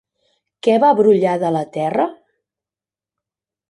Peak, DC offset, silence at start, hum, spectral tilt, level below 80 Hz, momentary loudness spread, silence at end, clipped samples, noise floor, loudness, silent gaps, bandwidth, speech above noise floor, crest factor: -2 dBFS; under 0.1%; 0.65 s; none; -7 dB/octave; -66 dBFS; 9 LU; 1.55 s; under 0.1%; under -90 dBFS; -16 LUFS; none; 11 kHz; over 75 dB; 16 dB